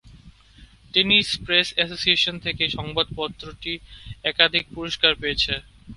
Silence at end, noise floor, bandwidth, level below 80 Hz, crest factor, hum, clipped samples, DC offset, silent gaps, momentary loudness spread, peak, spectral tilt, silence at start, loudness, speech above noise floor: 0 s; -50 dBFS; 11.5 kHz; -46 dBFS; 24 dB; none; under 0.1%; under 0.1%; none; 13 LU; 0 dBFS; -3 dB/octave; 0.05 s; -21 LUFS; 27 dB